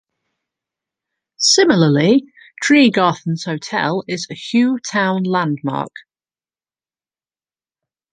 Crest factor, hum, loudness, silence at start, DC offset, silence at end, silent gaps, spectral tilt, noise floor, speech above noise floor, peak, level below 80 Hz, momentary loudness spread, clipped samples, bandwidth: 16 dB; none; -16 LUFS; 1.4 s; under 0.1%; 2.15 s; none; -4.5 dB/octave; under -90 dBFS; over 74 dB; -2 dBFS; -64 dBFS; 12 LU; under 0.1%; 10 kHz